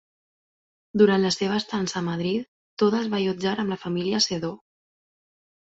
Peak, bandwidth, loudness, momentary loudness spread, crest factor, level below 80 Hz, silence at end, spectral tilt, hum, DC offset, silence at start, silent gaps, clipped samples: -6 dBFS; 8 kHz; -24 LUFS; 11 LU; 20 dB; -64 dBFS; 1.1 s; -5 dB/octave; none; under 0.1%; 0.95 s; 2.48-2.77 s; under 0.1%